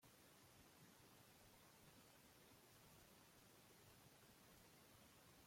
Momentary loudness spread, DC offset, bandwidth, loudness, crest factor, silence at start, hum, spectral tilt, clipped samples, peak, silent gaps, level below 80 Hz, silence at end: 1 LU; under 0.1%; 16.5 kHz; -68 LUFS; 14 dB; 0 s; none; -3 dB/octave; under 0.1%; -56 dBFS; none; -86 dBFS; 0 s